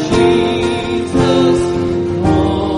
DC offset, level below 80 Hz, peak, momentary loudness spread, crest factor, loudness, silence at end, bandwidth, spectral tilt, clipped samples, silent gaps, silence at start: under 0.1%; -30 dBFS; 0 dBFS; 5 LU; 12 dB; -14 LUFS; 0 s; 10.5 kHz; -6.5 dB/octave; under 0.1%; none; 0 s